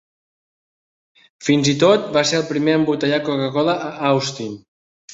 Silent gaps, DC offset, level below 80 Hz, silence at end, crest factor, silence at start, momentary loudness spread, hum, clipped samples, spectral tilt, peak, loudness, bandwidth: 4.68-5.08 s; under 0.1%; -60 dBFS; 0 s; 18 dB; 1.4 s; 11 LU; none; under 0.1%; -5 dB/octave; -2 dBFS; -18 LUFS; 8 kHz